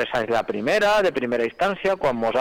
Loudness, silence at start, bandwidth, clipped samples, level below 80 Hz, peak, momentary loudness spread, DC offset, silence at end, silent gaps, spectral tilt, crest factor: -22 LUFS; 0 s; 18 kHz; under 0.1%; -52 dBFS; -14 dBFS; 5 LU; under 0.1%; 0 s; none; -4.5 dB/octave; 8 dB